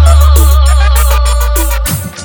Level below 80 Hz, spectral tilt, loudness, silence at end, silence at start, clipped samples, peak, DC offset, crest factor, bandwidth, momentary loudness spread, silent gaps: -8 dBFS; -4.5 dB/octave; -9 LUFS; 0 s; 0 s; 2%; 0 dBFS; under 0.1%; 6 dB; over 20 kHz; 7 LU; none